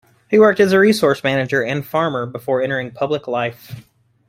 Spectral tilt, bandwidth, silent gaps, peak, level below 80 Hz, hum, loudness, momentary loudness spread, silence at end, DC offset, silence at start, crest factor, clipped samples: -6 dB/octave; 16 kHz; none; -2 dBFS; -58 dBFS; none; -17 LUFS; 11 LU; 0.45 s; under 0.1%; 0.3 s; 16 dB; under 0.1%